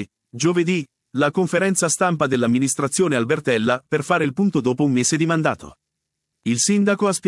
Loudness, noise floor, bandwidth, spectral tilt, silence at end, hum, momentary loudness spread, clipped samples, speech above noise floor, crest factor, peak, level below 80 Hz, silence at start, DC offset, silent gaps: -20 LUFS; -79 dBFS; 12 kHz; -4.5 dB/octave; 0 s; none; 6 LU; under 0.1%; 60 dB; 16 dB; -4 dBFS; -62 dBFS; 0 s; under 0.1%; none